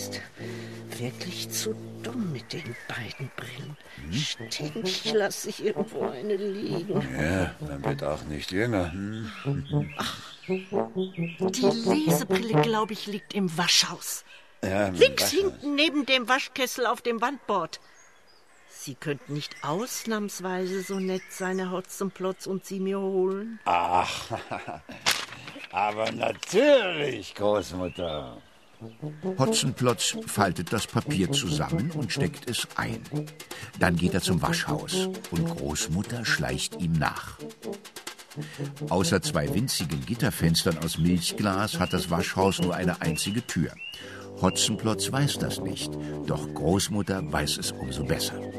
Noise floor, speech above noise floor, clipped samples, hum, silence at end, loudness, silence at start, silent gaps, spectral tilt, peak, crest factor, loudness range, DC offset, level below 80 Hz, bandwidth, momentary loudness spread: -58 dBFS; 31 dB; under 0.1%; none; 0 s; -27 LUFS; 0 s; none; -4 dB/octave; -4 dBFS; 24 dB; 6 LU; 0.1%; -50 dBFS; 14 kHz; 13 LU